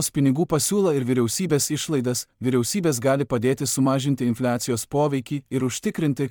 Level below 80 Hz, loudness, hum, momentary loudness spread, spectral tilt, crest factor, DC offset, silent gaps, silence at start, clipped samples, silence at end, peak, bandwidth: -56 dBFS; -23 LUFS; none; 5 LU; -5 dB/octave; 14 dB; under 0.1%; none; 0 s; under 0.1%; 0 s; -8 dBFS; 18.5 kHz